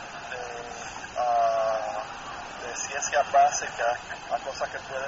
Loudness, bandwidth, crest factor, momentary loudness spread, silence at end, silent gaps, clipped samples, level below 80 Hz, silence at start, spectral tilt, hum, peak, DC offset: -28 LUFS; 8 kHz; 18 dB; 14 LU; 0 s; none; under 0.1%; -58 dBFS; 0 s; -0.5 dB/octave; none; -10 dBFS; under 0.1%